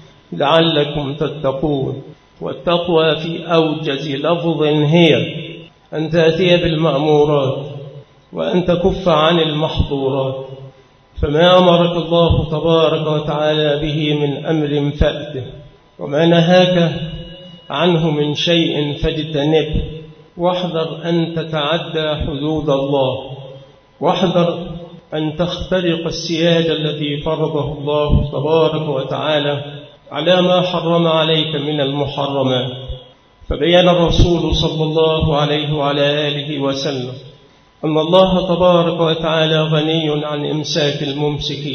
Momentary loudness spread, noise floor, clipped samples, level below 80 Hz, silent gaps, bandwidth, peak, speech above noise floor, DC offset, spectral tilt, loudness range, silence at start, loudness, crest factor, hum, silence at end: 14 LU; -47 dBFS; under 0.1%; -32 dBFS; none; 6.6 kHz; 0 dBFS; 32 dB; under 0.1%; -6.5 dB/octave; 4 LU; 0.3 s; -16 LUFS; 16 dB; none; 0 s